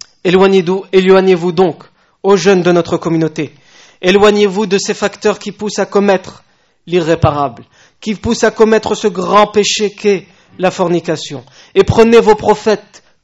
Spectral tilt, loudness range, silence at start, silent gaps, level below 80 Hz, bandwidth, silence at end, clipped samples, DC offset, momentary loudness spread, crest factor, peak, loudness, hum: -5 dB/octave; 3 LU; 0.25 s; none; -40 dBFS; 8.2 kHz; 0.45 s; 0.5%; under 0.1%; 11 LU; 12 dB; 0 dBFS; -12 LUFS; none